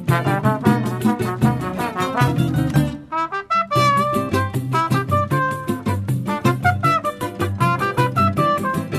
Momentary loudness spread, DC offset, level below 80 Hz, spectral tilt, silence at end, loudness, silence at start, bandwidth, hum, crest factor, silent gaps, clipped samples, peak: 6 LU; under 0.1%; -44 dBFS; -6.5 dB/octave; 0 s; -19 LUFS; 0 s; 13.5 kHz; none; 18 dB; none; under 0.1%; -2 dBFS